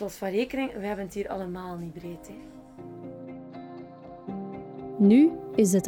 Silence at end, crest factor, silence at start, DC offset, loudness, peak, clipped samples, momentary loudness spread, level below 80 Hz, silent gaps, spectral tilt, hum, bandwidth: 0 s; 18 dB; 0 s; under 0.1%; -26 LUFS; -10 dBFS; under 0.1%; 24 LU; -58 dBFS; none; -6.5 dB/octave; none; 17 kHz